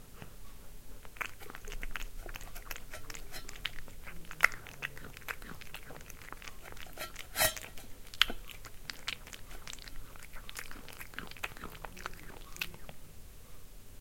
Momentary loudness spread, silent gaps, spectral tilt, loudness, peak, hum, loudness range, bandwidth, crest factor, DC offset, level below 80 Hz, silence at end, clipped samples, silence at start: 22 LU; none; -1 dB/octave; -39 LUFS; -2 dBFS; none; 9 LU; 17 kHz; 38 dB; under 0.1%; -50 dBFS; 0 s; under 0.1%; 0 s